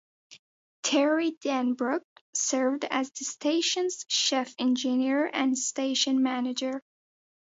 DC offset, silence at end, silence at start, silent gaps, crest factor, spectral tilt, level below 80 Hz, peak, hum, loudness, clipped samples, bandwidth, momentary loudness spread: under 0.1%; 0.65 s; 0.3 s; 0.39-0.83 s, 1.37-1.41 s, 2.04-2.33 s; 16 dB; -1 dB/octave; -82 dBFS; -12 dBFS; none; -27 LUFS; under 0.1%; 8 kHz; 7 LU